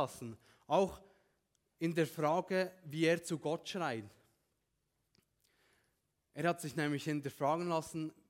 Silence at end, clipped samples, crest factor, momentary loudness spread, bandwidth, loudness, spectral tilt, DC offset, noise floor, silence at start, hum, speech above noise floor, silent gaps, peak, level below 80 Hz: 0.15 s; under 0.1%; 20 dB; 9 LU; 16.5 kHz; -37 LUFS; -5.5 dB/octave; under 0.1%; -83 dBFS; 0 s; none; 47 dB; none; -18 dBFS; -74 dBFS